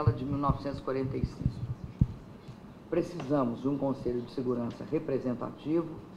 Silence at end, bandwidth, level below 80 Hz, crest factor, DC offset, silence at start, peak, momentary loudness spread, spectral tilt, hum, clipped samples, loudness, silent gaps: 0 s; 10.5 kHz; -46 dBFS; 22 dB; under 0.1%; 0 s; -10 dBFS; 9 LU; -9 dB/octave; none; under 0.1%; -33 LUFS; none